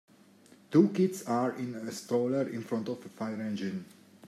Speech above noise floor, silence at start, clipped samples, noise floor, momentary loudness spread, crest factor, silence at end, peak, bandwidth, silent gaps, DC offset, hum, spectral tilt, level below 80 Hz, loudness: 28 dB; 0.7 s; under 0.1%; -59 dBFS; 12 LU; 22 dB; 0 s; -10 dBFS; 14.5 kHz; none; under 0.1%; none; -6.5 dB/octave; -80 dBFS; -31 LUFS